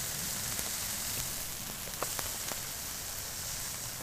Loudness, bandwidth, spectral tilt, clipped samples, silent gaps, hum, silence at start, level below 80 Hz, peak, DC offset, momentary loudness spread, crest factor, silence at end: -35 LUFS; 16 kHz; -1 dB/octave; under 0.1%; none; none; 0 s; -54 dBFS; -8 dBFS; under 0.1%; 4 LU; 30 dB; 0 s